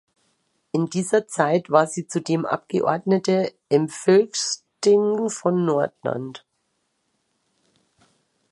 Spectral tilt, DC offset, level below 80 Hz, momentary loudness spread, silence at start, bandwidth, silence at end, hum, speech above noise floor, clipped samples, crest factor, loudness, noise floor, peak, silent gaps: -5 dB/octave; under 0.1%; -72 dBFS; 9 LU; 0.75 s; 11.5 kHz; 2.15 s; none; 52 dB; under 0.1%; 20 dB; -22 LUFS; -72 dBFS; -2 dBFS; none